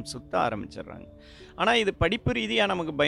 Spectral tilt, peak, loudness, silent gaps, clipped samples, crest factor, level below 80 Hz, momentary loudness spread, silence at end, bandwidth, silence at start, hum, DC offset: -5 dB/octave; -8 dBFS; -26 LUFS; none; under 0.1%; 18 dB; -48 dBFS; 19 LU; 0 s; 12.5 kHz; 0 s; none; under 0.1%